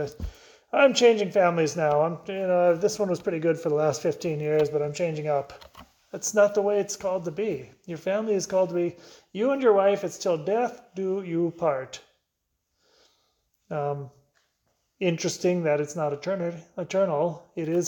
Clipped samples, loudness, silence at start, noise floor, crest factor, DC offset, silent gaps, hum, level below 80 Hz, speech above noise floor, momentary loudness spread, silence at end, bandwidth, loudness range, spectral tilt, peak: under 0.1%; -25 LUFS; 0 s; -79 dBFS; 20 dB; under 0.1%; none; none; -56 dBFS; 54 dB; 13 LU; 0 s; 19 kHz; 9 LU; -5 dB/octave; -6 dBFS